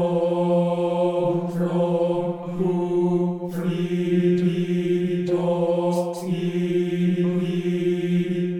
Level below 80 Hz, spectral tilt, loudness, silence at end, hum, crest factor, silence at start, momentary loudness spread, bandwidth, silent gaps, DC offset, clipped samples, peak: -60 dBFS; -8.5 dB/octave; -23 LUFS; 0 s; none; 12 dB; 0 s; 5 LU; 10.5 kHz; none; under 0.1%; under 0.1%; -10 dBFS